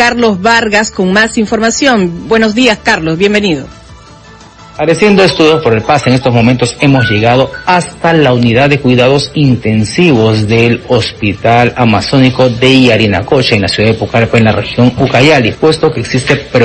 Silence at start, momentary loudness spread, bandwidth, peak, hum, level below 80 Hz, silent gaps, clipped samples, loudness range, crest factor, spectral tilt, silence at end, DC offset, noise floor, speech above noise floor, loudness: 0 s; 5 LU; 11 kHz; 0 dBFS; none; -36 dBFS; none; 1%; 2 LU; 8 dB; -5.5 dB/octave; 0 s; under 0.1%; -34 dBFS; 26 dB; -8 LUFS